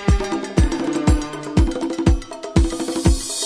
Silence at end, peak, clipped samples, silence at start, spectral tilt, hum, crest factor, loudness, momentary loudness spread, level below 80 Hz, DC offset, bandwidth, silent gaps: 0 s; 0 dBFS; under 0.1%; 0 s; -5.5 dB/octave; none; 18 dB; -20 LUFS; 3 LU; -22 dBFS; under 0.1%; 11 kHz; none